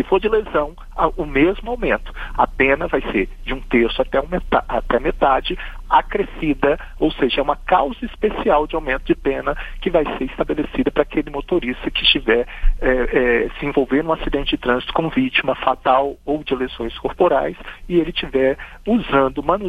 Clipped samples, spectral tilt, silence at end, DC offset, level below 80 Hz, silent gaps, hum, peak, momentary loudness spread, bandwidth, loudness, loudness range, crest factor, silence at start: under 0.1%; -7 dB/octave; 0 s; under 0.1%; -30 dBFS; none; none; 0 dBFS; 7 LU; 8.6 kHz; -19 LUFS; 2 LU; 18 dB; 0 s